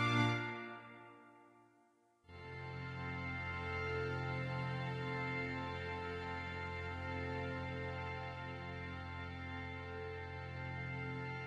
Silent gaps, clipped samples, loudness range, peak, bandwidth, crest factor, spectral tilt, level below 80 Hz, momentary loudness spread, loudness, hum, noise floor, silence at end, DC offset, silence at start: none; under 0.1%; 4 LU; -22 dBFS; 9.6 kHz; 20 dB; -6.5 dB/octave; -62 dBFS; 9 LU; -43 LUFS; none; -72 dBFS; 0 s; under 0.1%; 0 s